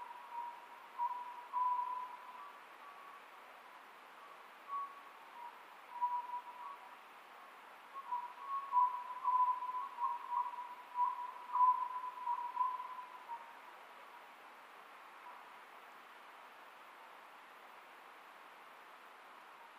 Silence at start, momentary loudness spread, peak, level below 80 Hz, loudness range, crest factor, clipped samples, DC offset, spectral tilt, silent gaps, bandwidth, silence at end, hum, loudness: 0 s; 21 LU; -22 dBFS; under -90 dBFS; 18 LU; 20 dB; under 0.1%; under 0.1%; -1 dB/octave; none; 15.5 kHz; 0 s; none; -40 LUFS